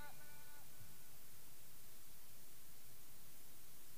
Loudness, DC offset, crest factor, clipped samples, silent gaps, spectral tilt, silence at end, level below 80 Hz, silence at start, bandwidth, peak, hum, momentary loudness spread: -60 LUFS; 0.6%; 16 dB; under 0.1%; none; -2.5 dB/octave; 0 s; -76 dBFS; 0 s; 15.5 kHz; -40 dBFS; none; 1 LU